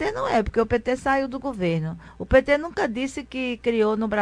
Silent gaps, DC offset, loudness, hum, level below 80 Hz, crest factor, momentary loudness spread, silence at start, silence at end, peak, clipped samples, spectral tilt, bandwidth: none; under 0.1%; -24 LUFS; none; -40 dBFS; 20 dB; 9 LU; 0 s; 0 s; -4 dBFS; under 0.1%; -6 dB/octave; 10.5 kHz